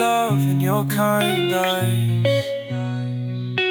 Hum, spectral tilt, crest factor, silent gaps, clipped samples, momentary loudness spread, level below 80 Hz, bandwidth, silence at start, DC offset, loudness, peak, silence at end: none; -5.5 dB/octave; 14 dB; none; under 0.1%; 8 LU; -62 dBFS; 19.5 kHz; 0 s; under 0.1%; -20 LUFS; -6 dBFS; 0 s